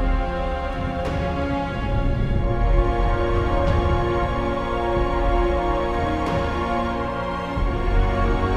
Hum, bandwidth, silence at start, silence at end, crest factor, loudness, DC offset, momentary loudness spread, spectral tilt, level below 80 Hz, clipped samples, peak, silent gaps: none; 7.8 kHz; 0 s; 0 s; 14 dB; -23 LUFS; under 0.1%; 4 LU; -7.5 dB/octave; -24 dBFS; under 0.1%; -6 dBFS; none